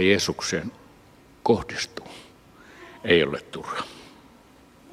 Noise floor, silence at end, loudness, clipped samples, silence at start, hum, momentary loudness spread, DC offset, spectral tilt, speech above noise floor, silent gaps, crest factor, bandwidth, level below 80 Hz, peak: -53 dBFS; 0.85 s; -25 LUFS; under 0.1%; 0 s; none; 24 LU; under 0.1%; -4 dB/octave; 28 dB; none; 22 dB; 15 kHz; -56 dBFS; -6 dBFS